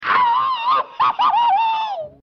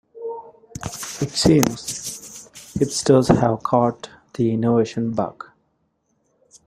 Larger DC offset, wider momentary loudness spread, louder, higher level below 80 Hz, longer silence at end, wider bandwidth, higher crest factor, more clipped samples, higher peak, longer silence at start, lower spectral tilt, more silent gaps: neither; second, 5 LU vs 21 LU; first, -17 LUFS vs -20 LUFS; second, -68 dBFS vs -48 dBFS; second, 0.15 s vs 1.35 s; second, 6.4 kHz vs 16 kHz; second, 10 dB vs 22 dB; neither; second, -6 dBFS vs 0 dBFS; second, 0 s vs 0.15 s; second, -3 dB/octave vs -5.5 dB/octave; neither